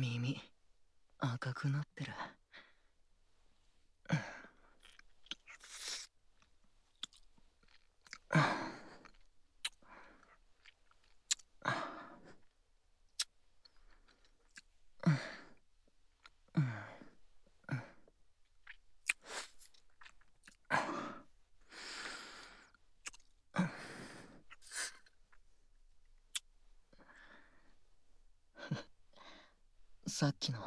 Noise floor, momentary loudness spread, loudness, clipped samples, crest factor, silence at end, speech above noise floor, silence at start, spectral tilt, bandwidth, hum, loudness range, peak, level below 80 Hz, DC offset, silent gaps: -72 dBFS; 24 LU; -41 LUFS; under 0.1%; 30 dB; 0 s; 32 dB; 0 s; -4.5 dB/octave; 11 kHz; none; 9 LU; -16 dBFS; -70 dBFS; under 0.1%; none